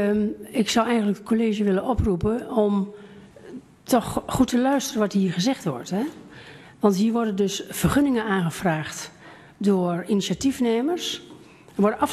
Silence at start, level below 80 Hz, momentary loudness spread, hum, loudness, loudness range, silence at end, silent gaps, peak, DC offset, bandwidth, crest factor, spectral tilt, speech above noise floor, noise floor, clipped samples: 0 s; -44 dBFS; 13 LU; none; -23 LUFS; 1 LU; 0 s; none; -6 dBFS; under 0.1%; 14 kHz; 18 dB; -5.5 dB/octave; 22 dB; -45 dBFS; under 0.1%